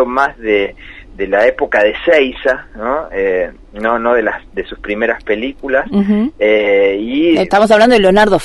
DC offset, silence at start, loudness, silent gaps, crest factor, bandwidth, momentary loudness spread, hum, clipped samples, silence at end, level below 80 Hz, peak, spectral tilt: under 0.1%; 0 s; -13 LUFS; none; 12 dB; 11.5 kHz; 11 LU; none; under 0.1%; 0 s; -38 dBFS; 0 dBFS; -5.5 dB/octave